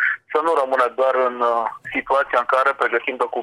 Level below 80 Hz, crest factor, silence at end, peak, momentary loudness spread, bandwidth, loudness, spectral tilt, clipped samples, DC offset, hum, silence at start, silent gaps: -62 dBFS; 16 dB; 0 s; -2 dBFS; 5 LU; 12 kHz; -19 LUFS; -3.5 dB/octave; under 0.1%; under 0.1%; none; 0 s; none